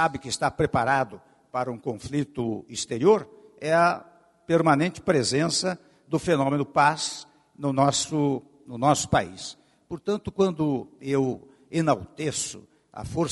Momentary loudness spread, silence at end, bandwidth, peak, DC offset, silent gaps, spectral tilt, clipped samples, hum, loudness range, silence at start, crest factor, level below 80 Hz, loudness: 13 LU; 0 s; 11.5 kHz; -6 dBFS; under 0.1%; none; -4.5 dB/octave; under 0.1%; none; 4 LU; 0 s; 20 dB; -54 dBFS; -25 LUFS